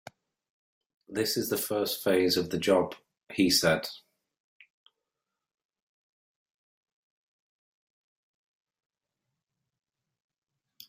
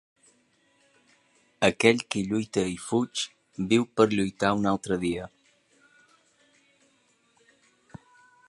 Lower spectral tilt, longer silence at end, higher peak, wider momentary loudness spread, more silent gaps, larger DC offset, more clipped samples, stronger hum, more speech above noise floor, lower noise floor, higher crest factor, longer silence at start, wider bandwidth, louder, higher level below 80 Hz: second, -3.5 dB/octave vs -5 dB/octave; first, 6.9 s vs 3.2 s; second, -10 dBFS vs -4 dBFS; about the same, 13 LU vs 11 LU; first, 3.23-3.27 s vs none; neither; neither; neither; first, 61 dB vs 41 dB; first, -88 dBFS vs -67 dBFS; about the same, 22 dB vs 26 dB; second, 1.1 s vs 1.6 s; first, 16 kHz vs 11.5 kHz; about the same, -27 LUFS vs -26 LUFS; second, -70 dBFS vs -60 dBFS